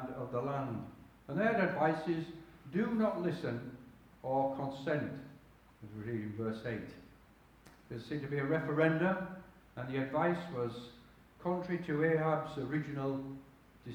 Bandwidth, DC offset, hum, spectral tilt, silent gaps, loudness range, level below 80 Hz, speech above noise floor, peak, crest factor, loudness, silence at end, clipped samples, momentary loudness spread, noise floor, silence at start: 20 kHz; under 0.1%; none; -8 dB/octave; none; 5 LU; -66 dBFS; 27 dB; -16 dBFS; 20 dB; -36 LUFS; 0 s; under 0.1%; 20 LU; -62 dBFS; 0 s